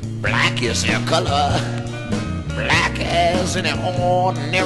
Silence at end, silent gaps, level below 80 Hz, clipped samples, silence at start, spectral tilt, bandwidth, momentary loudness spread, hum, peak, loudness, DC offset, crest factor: 0 s; none; -36 dBFS; under 0.1%; 0 s; -4.5 dB/octave; 12 kHz; 8 LU; none; -4 dBFS; -19 LUFS; under 0.1%; 16 dB